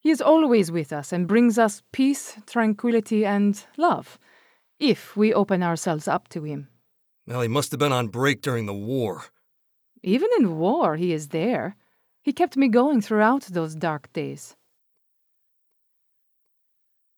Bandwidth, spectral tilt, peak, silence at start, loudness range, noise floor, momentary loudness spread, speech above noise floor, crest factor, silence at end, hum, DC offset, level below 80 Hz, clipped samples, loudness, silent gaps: over 20 kHz; -6 dB/octave; -6 dBFS; 0.05 s; 4 LU; -70 dBFS; 11 LU; 48 dB; 18 dB; 2.7 s; none; under 0.1%; -78 dBFS; under 0.1%; -23 LUFS; none